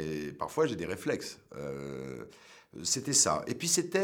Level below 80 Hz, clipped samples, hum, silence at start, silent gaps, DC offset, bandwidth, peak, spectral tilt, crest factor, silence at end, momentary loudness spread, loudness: -64 dBFS; under 0.1%; none; 0 s; none; under 0.1%; over 20 kHz; -12 dBFS; -2.5 dB/octave; 22 dB; 0 s; 18 LU; -31 LUFS